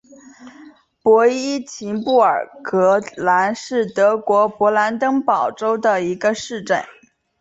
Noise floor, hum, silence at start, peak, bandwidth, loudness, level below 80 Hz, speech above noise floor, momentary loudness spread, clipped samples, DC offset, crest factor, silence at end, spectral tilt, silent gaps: -45 dBFS; none; 0.4 s; -2 dBFS; 8 kHz; -18 LUFS; -64 dBFS; 28 dB; 8 LU; under 0.1%; under 0.1%; 16 dB; 0.55 s; -4.5 dB/octave; none